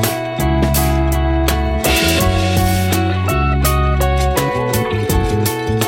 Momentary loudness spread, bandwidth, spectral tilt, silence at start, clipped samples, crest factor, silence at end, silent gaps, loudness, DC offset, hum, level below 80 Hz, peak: 4 LU; 17 kHz; -5 dB/octave; 0 s; under 0.1%; 14 dB; 0 s; none; -16 LUFS; under 0.1%; none; -20 dBFS; 0 dBFS